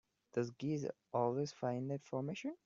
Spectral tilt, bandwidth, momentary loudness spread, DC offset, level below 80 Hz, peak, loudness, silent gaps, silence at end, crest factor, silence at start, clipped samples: -7 dB/octave; 7.6 kHz; 5 LU; under 0.1%; -80 dBFS; -22 dBFS; -41 LUFS; none; 0.1 s; 18 dB; 0.35 s; under 0.1%